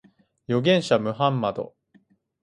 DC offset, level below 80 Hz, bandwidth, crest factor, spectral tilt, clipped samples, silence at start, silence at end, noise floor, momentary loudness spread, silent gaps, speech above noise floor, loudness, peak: under 0.1%; -64 dBFS; 11 kHz; 20 dB; -6 dB/octave; under 0.1%; 0.5 s; 0.75 s; -61 dBFS; 12 LU; none; 39 dB; -23 LUFS; -6 dBFS